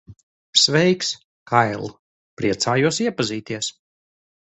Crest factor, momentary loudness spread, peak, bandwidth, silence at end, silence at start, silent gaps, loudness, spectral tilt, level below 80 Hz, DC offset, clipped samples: 22 dB; 13 LU; 0 dBFS; 8.4 kHz; 0.7 s; 0.1 s; 0.23-0.53 s, 1.24-1.46 s, 1.99-2.37 s; -20 LUFS; -3.5 dB/octave; -58 dBFS; under 0.1%; under 0.1%